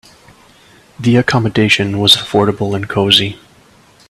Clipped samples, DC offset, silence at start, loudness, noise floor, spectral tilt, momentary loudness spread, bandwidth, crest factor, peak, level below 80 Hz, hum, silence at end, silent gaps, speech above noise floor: under 0.1%; under 0.1%; 1 s; -12 LUFS; -46 dBFS; -4.5 dB/octave; 9 LU; 16 kHz; 14 dB; 0 dBFS; -48 dBFS; none; 0.75 s; none; 34 dB